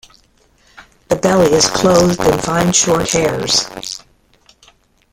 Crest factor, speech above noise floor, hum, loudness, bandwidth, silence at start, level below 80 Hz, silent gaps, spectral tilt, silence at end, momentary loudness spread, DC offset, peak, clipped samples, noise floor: 16 dB; 40 dB; none; -13 LUFS; 17 kHz; 0.8 s; -40 dBFS; none; -3.5 dB/octave; 1.15 s; 12 LU; under 0.1%; 0 dBFS; under 0.1%; -53 dBFS